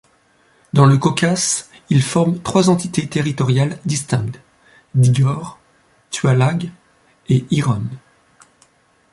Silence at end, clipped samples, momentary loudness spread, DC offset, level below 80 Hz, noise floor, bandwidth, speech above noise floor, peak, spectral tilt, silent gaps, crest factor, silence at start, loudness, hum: 1.15 s; under 0.1%; 14 LU; under 0.1%; -52 dBFS; -56 dBFS; 11.5 kHz; 40 dB; -2 dBFS; -5.5 dB/octave; none; 16 dB; 0.75 s; -17 LUFS; none